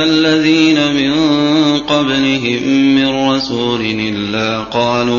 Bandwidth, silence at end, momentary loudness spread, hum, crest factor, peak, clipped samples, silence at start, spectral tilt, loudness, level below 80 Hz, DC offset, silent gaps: 7.2 kHz; 0 s; 6 LU; none; 12 dB; 0 dBFS; under 0.1%; 0 s; -5 dB/octave; -13 LUFS; -44 dBFS; under 0.1%; none